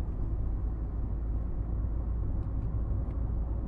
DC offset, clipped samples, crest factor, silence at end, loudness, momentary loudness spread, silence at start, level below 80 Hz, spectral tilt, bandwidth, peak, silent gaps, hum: under 0.1%; under 0.1%; 10 dB; 0 s; -35 LUFS; 2 LU; 0 s; -32 dBFS; -12 dB/octave; 2.1 kHz; -22 dBFS; none; none